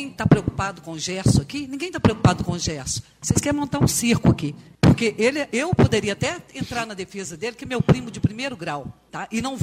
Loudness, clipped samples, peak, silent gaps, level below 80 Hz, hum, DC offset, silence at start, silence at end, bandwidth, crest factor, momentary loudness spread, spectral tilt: -22 LUFS; under 0.1%; -2 dBFS; none; -40 dBFS; none; under 0.1%; 0 s; 0 s; 15.5 kHz; 20 dB; 12 LU; -5.5 dB/octave